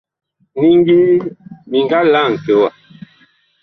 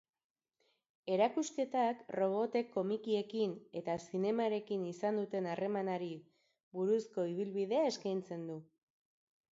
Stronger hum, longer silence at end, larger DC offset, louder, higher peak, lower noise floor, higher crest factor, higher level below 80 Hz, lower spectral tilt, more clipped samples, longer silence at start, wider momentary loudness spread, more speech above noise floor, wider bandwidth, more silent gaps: neither; about the same, 0.95 s vs 0.9 s; neither; first, -13 LUFS vs -37 LUFS; first, -2 dBFS vs -18 dBFS; second, -53 dBFS vs -80 dBFS; second, 12 dB vs 18 dB; first, -56 dBFS vs -84 dBFS; first, -8 dB/octave vs -5.5 dB/octave; neither; second, 0.55 s vs 1.05 s; about the same, 9 LU vs 10 LU; about the same, 41 dB vs 44 dB; second, 6 kHz vs 7.6 kHz; second, none vs 6.63-6.71 s